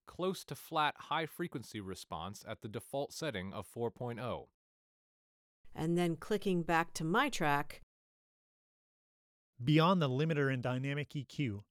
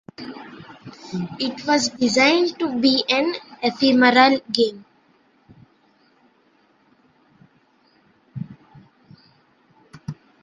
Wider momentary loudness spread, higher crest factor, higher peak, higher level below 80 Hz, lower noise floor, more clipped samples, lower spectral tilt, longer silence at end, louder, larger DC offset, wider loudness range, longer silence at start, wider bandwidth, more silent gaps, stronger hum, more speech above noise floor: second, 13 LU vs 23 LU; about the same, 20 dB vs 22 dB; second, -16 dBFS vs -2 dBFS; about the same, -64 dBFS vs -64 dBFS; first, under -90 dBFS vs -60 dBFS; neither; first, -6 dB/octave vs -3.5 dB/octave; second, 0.1 s vs 0.3 s; second, -36 LUFS vs -19 LUFS; neither; second, 7 LU vs 12 LU; second, 0.05 s vs 0.2 s; first, 16.5 kHz vs 9.4 kHz; first, 4.54-5.64 s, 7.83-9.53 s vs none; neither; first, over 54 dB vs 41 dB